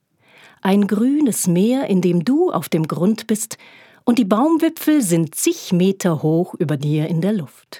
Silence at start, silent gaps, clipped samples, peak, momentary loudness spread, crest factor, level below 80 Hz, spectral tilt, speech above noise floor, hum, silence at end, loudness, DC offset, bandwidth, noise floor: 0.65 s; none; under 0.1%; -2 dBFS; 6 LU; 16 dB; -76 dBFS; -6 dB/octave; 33 dB; none; 0 s; -18 LUFS; under 0.1%; 18.5 kHz; -50 dBFS